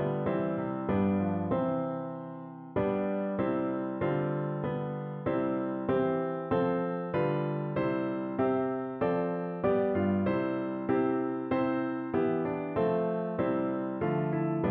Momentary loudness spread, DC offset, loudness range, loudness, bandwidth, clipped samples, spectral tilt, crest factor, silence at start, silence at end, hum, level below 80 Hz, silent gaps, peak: 5 LU; under 0.1%; 2 LU; -31 LUFS; 4.5 kHz; under 0.1%; -7.5 dB/octave; 14 dB; 0 s; 0 s; none; -62 dBFS; none; -16 dBFS